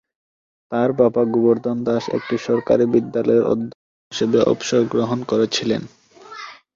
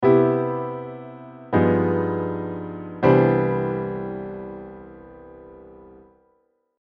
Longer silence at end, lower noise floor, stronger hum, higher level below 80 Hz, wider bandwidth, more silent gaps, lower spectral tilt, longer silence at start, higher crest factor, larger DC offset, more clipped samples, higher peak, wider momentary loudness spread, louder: second, 0.2 s vs 0.9 s; second, -38 dBFS vs -67 dBFS; neither; about the same, -58 dBFS vs -54 dBFS; first, 7.6 kHz vs 5.2 kHz; first, 3.75-4.11 s vs none; second, -5.5 dB/octave vs -11 dB/octave; first, 0.7 s vs 0 s; about the same, 18 dB vs 20 dB; neither; neither; about the same, -2 dBFS vs -4 dBFS; second, 12 LU vs 26 LU; first, -19 LUFS vs -22 LUFS